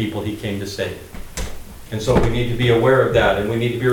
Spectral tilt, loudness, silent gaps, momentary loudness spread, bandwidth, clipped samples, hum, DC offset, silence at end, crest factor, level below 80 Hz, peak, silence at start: -6 dB/octave; -19 LUFS; none; 17 LU; 18 kHz; under 0.1%; none; under 0.1%; 0 s; 16 dB; -32 dBFS; -2 dBFS; 0 s